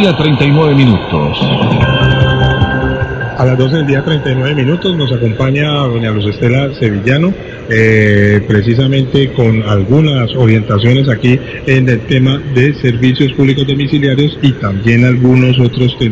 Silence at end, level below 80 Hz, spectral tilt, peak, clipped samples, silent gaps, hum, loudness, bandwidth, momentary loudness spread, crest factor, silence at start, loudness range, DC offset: 0 s; -30 dBFS; -8 dB/octave; 0 dBFS; 1%; none; none; -10 LUFS; 7.6 kHz; 5 LU; 10 dB; 0 s; 2 LU; under 0.1%